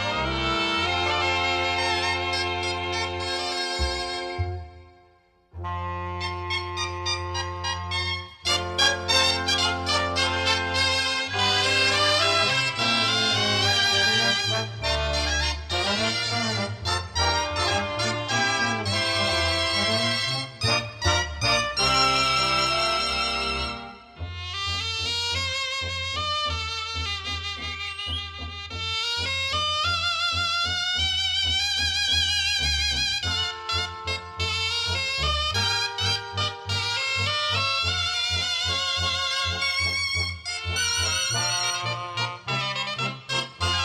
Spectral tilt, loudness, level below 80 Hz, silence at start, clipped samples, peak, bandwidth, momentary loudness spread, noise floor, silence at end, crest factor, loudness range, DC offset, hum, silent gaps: -2.5 dB/octave; -23 LUFS; -44 dBFS; 0 s; under 0.1%; -8 dBFS; 13.5 kHz; 9 LU; -60 dBFS; 0 s; 18 dB; 7 LU; under 0.1%; none; none